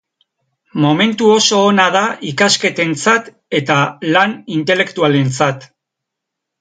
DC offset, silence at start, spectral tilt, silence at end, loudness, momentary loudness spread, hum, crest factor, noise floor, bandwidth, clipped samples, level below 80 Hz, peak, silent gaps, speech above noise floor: under 0.1%; 0.75 s; -4 dB/octave; 0.95 s; -13 LUFS; 8 LU; none; 14 dB; -79 dBFS; 9.6 kHz; under 0.1%; -62 dBFS; 0 dBFS; none; 66 dB